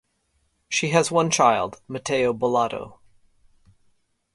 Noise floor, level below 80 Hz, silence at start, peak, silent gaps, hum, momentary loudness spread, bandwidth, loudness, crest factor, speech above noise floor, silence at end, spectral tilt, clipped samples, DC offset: -69 dBFS; -60 dBFS; 0.7 s; -4 dBFS; none; none; 13 LU; 11.5 kHz; -22 LUFS; 22 dB; 48 dB; 1.45 s; -4 dB/octave; under 0.1%; under 0.1%